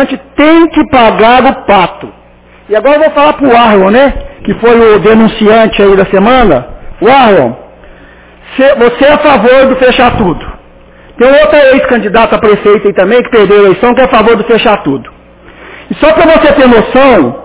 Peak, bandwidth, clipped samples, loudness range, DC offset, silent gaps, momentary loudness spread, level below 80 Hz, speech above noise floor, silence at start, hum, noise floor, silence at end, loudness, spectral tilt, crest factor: 0 dBFS; 4 kHz; 7%; 2 LU; under 0.1%; none; 8 LU; -28 dBFS; 32 dB; 0 s; none; -37 dBFS; 0 s; -5 LUFS; -9.5 dB/octave; 6 dB